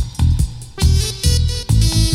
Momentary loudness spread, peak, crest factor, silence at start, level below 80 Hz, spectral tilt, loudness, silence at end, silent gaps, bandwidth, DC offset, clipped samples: 4 LU; 0 dBFS; 14 dB; 0 s; -18 dBFS; -4.5 dB/octave; -17 LUFS; 0 s; none; 15.5 kHz; under 0.1%; under 0.1%